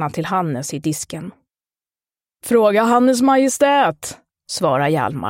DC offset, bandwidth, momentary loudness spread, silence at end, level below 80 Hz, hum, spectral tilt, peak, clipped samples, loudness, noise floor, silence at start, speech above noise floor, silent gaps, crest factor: under 0.1%; 16.5 kHz; 17 LU; 0 s; -58 dBFS; none; -5 dB/octave; -2 dBFS; under 0.1%; -17 LUFS; under -90 dBFS; 0 s; over 73 dB; none; 16 dB